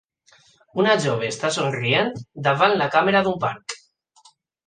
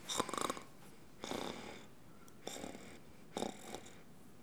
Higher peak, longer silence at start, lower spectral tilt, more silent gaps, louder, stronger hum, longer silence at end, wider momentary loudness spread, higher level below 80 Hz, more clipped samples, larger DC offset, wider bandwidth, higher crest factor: first, -2 dBFS vs -18 dBFS; first, 0.75 s vs 0 s; first, -4.5 dB/octave vs -2.5 dB/octave; neither; first, -21 LUFS vs -45 LUFS; neither; first, 0.9 s vs 0 s; second, 12 LU vs 20 LU; first, -62 dBFS vs -72 dBFS; neither; second, under 0.1% vs 0.1%; second, 9.8 kHz vs over 20 kHz; second, 20 dB vs 30 dB